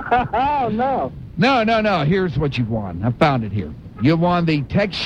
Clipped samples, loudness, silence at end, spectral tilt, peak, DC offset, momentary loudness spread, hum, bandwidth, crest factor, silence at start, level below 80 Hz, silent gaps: under 0.1%; -19 LUFS; 0 s; -7.5 dB/octave; -2 dBFS; under 0.1%; 8 LU; none; 8.8 kHz; 16 dB; 0 s; -40 dBFS; none